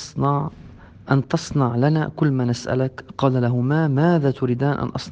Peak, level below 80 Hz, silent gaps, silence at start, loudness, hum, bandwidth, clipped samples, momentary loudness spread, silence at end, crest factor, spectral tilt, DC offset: -2 dBFS; -50 dBFS; none; 0 s; -21 LUFS; none; 8.6 kHz; under 0.1%; 5 LU; 0 s; 18 dB; -7.5 dB/octave; under 0.1%